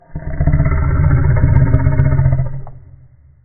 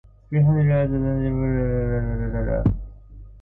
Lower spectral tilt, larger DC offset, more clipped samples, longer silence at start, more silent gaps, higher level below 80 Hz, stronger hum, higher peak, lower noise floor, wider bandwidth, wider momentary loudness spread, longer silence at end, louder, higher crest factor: about the same, -12 dB/octave vs -13 dB/octave; neither; neither; second, 0.1 s vs 0.3 s; neither; first, -20 dBFS vs -30 dBFS; neither; first, 0 dBFS vs -8 dBFS; about the same, -43 dBFS vs -42 dBFS; second, 2.3 kHz vs 3.6 kHz; about the same, 10 LU vs 8 LU; first, 0.65 s vs 0 s; first, -14 LUFS vs -22 LUFS; about the same, 14 dB vs 14 dB